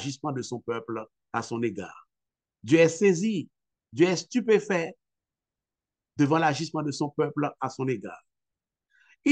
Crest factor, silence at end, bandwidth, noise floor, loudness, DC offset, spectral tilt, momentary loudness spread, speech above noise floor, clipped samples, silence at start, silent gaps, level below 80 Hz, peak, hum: 20 dB; 0 s; 9.4 kHz; under -90 dBFS; -27 LUFS; under 0.1%; -5.5 dB/octave; 16 LU; over 64 dB; under 0.1%; 0 s; none; -74 dBFS; -8 dBFS; none